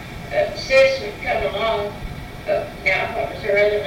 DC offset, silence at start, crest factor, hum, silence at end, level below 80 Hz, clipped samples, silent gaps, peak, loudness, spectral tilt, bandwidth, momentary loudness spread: under 0.1%; 0 s; 16 dB; none; 0 s; -40 dBFS; under 0.1%; none; -6 dBFS; -20 LUFS; -4.5 dB/octave; 16.5 kHz; 12 LU